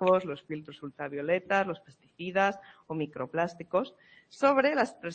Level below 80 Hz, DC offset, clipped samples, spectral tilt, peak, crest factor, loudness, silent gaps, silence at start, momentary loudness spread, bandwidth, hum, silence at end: -72 dBFS; under 0.1%; under 0.1%; -6 dB/octave; -12 dBFS; 20 dB; -30 LUFS; none; 0 s; 15 LU; 8.6 kHz; none; 0 s